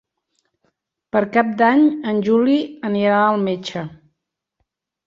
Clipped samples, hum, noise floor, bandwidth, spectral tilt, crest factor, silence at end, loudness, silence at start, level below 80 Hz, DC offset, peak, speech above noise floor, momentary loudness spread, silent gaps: under 0.1%; none; -77 dBFS; 7.4 kHz; -7 dB/octave; 18 dB; 1.1 s; -18 LUFS; 1.15 s; -64 dBFS; under 0.1%; -2 dBFS; 60 dB; 11 LU; none